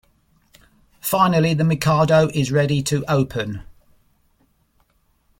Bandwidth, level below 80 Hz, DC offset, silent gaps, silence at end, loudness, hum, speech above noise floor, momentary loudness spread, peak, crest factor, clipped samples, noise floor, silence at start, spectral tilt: 16.5 kHz; -50 dBFS; under 0.1%; none; 1.8 s; -19 LUFS; none; 45 dB; 12 LU; -4 dBFS; 18 dB; under 0.1%; -62 dBFS; 1.05 s; -6 dB/octave